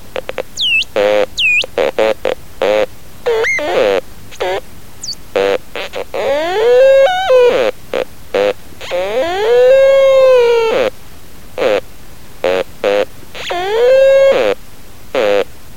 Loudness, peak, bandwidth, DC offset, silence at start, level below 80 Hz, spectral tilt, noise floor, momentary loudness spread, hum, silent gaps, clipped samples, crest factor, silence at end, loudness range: -13 LUFS; 0 dBFS; 16.5 kHz; 4%; 0.05 s; -42 dBFS; -3 dB/octave; -37 dBFS; 14 LU; none; none; under 0.1%; 14 dB; 0.3 s; 6 LU